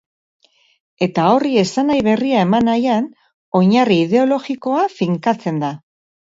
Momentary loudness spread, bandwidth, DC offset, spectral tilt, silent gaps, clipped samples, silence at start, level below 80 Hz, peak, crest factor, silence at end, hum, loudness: 8 LU; 8 kHz; under 0.1%; -6.5 dB/octave; 3.34-3.52 s; under 0.1%; 1 s; -58 dBFS; 0 dBFS; 16 dB; 0.5 s; none; -16 LUFS